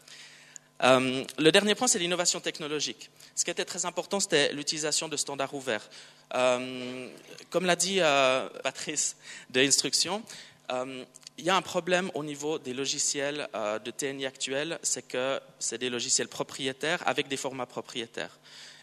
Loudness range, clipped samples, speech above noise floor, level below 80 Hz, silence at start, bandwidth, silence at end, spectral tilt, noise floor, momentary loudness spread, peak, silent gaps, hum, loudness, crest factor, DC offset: 5 LU; under 0.1%; 23 dB; -78 dBFS; 0.1 s; 13.5 kHz; 0.05 s; -2 dB/octave; -52 dBFS; 16 LU; -6 dBFS; none; none; -28 LUFS; 24 dB; under 0.1%